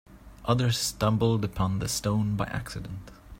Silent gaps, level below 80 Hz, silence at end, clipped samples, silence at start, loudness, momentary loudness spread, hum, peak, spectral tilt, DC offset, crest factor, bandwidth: none; -46 dBFS; 0 s; under 0.1%; 0.1 s; -28 LUFS; 13 LU; none; -10 dBFS; -5 dB/octave; under 0.1%; 18 dB; 16.5 kHz